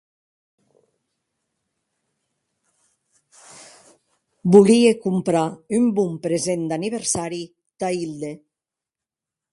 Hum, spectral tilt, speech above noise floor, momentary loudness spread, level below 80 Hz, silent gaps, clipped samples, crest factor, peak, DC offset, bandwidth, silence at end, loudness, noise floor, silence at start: none; -5.5 dB/octave; 69 dB; 18 LU; -64 dBFS; none; under 0.1%; 22 dB; 0 dBFS; under 0.1%; 11.5 kHz; 1.15 s; -20 LUFS; -88 dBFS; 3.6 s